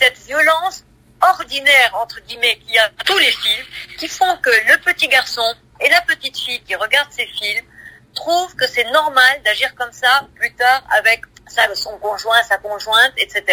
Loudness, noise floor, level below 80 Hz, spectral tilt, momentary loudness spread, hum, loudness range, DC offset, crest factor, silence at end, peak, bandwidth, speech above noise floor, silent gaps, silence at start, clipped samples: -15 LUFS; -41 dBFS; -54 dBFS; 0 dB/octave; 11 LU; none; 3 LU; under 0.1%; 16 dB; 0 s; 0 dBFS; 16 kHz; 25 dB; none; 0 s; under 0.1%